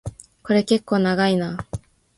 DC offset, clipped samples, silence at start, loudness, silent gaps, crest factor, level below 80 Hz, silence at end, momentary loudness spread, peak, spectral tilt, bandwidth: under 0.1%; under 0.1%; 0.05 s; -20 LUFS; none; 16 dB; -48 dBFS; 0.4 s; 17 LU; -4 dBFS; -6 dB/octave; 11.5 kHz